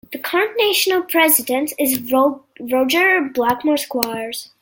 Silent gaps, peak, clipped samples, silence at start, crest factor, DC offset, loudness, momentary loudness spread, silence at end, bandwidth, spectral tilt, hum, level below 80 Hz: none; 0 dBFS; under 0.1%; 0.1 s; 18 dB; under 0.1%; -17 LUFS; 8 LU; 0.15 s; 17 kHz; -1.5 dB/octave; none; -62 dBFS